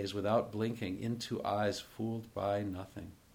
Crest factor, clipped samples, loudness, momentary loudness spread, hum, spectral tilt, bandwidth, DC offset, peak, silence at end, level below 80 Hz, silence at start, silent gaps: 18 dB; under 0.1%; -36 LUFS; 9 LU; none; -6 dB/octave; over 20 kHz; under 0.1%; -18 dBFS; 0.2 s; -66 dBFS; 0 s; none